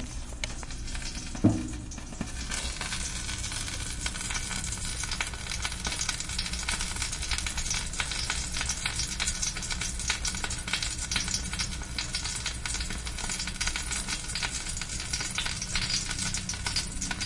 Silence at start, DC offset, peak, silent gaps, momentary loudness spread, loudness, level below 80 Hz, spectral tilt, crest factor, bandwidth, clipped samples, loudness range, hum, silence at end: 0 s; under 0.1%; -10 dBFS; none; 6 LU; -31 LUFS; -38 dBFS; -2 dB/octave; 22 dB; 11.5 kHz; under 0.1%; 3 LU; none; 0 s